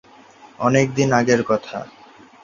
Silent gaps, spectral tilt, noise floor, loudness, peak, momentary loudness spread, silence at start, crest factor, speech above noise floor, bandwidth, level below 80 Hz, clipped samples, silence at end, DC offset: none; -5.5 dB/octave; -46 dBFS; -18 LUFS; -2 dBFS; 16 LU; 0.45 s; 18 dB; 28 dB; 7.4 kHz; -56 dBFS; under 0.1%; 0.55 s; under 0.1%